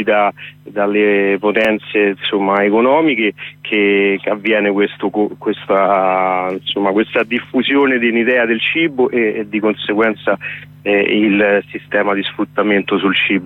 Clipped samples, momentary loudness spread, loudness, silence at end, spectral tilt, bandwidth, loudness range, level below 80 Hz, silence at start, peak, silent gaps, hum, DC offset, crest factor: under 0.1%; 7 LU; -15 LUFS; 0 s; -7 dB/octave; 4.3 kHz; 1 LU; -60 dBFS; 0 s; -2 dBFS; none; none; under 0.1%; 12 dB